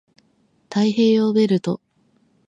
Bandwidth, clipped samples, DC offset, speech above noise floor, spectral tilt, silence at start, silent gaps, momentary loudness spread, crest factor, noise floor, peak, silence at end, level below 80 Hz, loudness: 7.8 kHz; under 0.1%; under 0.1%; 45 dB; -7 dB/octave; 0.7 s; none; 11 LU; 14 dB; -62 dBFS; -6 dBFS; 0.7 s; -68 dBFS; -19 LUFS